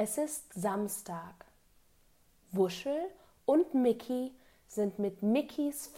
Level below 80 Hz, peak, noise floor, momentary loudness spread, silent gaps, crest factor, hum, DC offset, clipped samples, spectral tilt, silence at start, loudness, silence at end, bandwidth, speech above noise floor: -70 dBFS; -18 dBFS; -66 dBFS; 13 LU; none; 16 dB; none; under 0.1%; under 0.1%; -5.5 dB/octave; 0 s; -34 LUFS; 0 s; 16 kHz; 33 dB